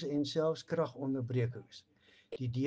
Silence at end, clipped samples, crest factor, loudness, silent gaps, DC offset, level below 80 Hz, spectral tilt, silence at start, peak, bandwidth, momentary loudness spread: 0 s; under 0.1%; 16 dB; -36 LUFS; none; under 0.1%; -70 dBFS; -7 dB/octave; 0 s; -20 dBFS; 8 kHz; 17 LU